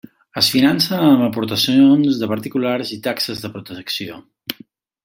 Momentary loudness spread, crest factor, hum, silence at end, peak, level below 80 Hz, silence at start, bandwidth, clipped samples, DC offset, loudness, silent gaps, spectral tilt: 18 LU; 18 dB; none; 0.5 s; 0 dBFS; -60 dBFS; 0.35 s; 16.5 kHz; under 0.1%; under 0.1%; -16 LUFS; none; -5 dB/octave